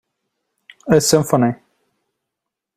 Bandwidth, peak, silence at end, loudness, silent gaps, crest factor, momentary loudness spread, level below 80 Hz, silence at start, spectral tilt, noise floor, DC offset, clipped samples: 16 kHz; -2 dBFS; 1.2 s; -16 LUFS; none; 18 dB; 21 LU; -54 dBFS; 0.85 s; -5 dB/octave; -82 dBFS; under 0.1%; under 0.1%